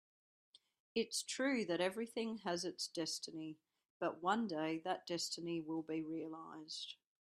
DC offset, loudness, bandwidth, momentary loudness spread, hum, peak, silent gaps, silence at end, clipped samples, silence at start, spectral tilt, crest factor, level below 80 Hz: under 0.1%; -42 LUFS; 14 kHz; 10 LU; none; -22 dBFS; 3.90-4.00 s; 0.3 s; under 0.1%; 0.95 s; -3.5 dB/octave; 20 dB; -86 dBFS